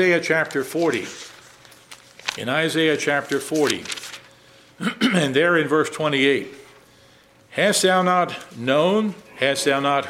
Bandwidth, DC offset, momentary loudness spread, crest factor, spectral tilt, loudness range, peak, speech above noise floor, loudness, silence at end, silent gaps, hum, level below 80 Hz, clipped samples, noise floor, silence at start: 16 kHz; under 0.1%; 13 LU; 20 dB; -4 dB/octave; 3 LU; -2 dBFS; 32 dB; -21 LUFS; 0 s; none; none; -66 dBFS; under 0.1%; -52 dBFS; 0 s